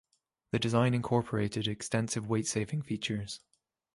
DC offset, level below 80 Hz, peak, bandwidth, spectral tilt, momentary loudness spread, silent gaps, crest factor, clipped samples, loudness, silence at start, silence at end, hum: under 0.1%; -60 dBFS; -14 dBFS; 11.5 kHz; -5 dB/octave; 8 LU; none; 20 dB; under 0.1%; -32 LUFS; 0.55 s; 0.6 s; none